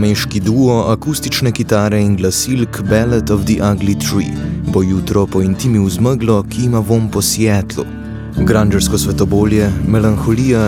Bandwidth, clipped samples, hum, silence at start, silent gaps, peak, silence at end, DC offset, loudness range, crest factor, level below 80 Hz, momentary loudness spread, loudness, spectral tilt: 17 kHz; under 0.1%; none; 0 s; none; 0 dBFS; 0 s; under 0.1%; 1 LU; 14 dB; -30 dBFS; 5 LU; -14 LUFS; -5.5 dB/octave